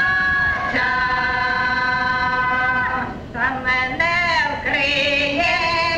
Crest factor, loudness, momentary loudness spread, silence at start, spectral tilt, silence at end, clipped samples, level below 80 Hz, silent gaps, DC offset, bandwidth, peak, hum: 14 dB; -18 LUFS; 4 LU; 0 s; -4 dB/octave; 0 s; under 0.1%; -40 dBFS; none; under 0.1%; 10.5 kHz; -6 dBFS; none